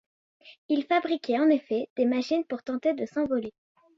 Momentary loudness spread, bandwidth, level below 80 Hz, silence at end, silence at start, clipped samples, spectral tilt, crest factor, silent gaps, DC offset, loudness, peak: 8 LU; 7.6 kHz; -70 dBFS; 0.5 s; 0.45 s; under 0.1%; -5.5 dB/octave; 16 dB; 0.58-0.69 s, 1.90-1.96 s; under 0.1%; -27 LUFS; -12 dBFS